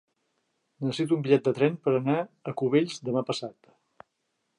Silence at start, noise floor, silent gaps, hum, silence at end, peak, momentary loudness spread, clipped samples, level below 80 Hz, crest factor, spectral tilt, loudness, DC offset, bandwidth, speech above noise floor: 0.8 s; -78 dBFS; none; none; 1.05 s; -8 dBFS; 11 LU; under 0.1%; -76 dBFS; 20 dB; -6.5 dB/octave; -27 LUFS; under 0.1%; 11 kHz; 52 dB